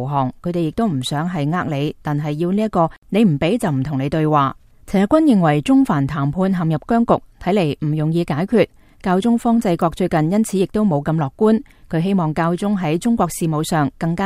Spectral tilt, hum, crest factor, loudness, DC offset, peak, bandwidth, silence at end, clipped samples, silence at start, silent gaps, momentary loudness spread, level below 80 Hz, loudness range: -7 dB/octave; none; 16 dB; -18 LUFS; under 0.1%; 0 dBFS; 15.5 kHz; 0 s; under 0.1%; 0 s; 2.98-3.02 s; 6 LU; -44 dBFS; 2 LU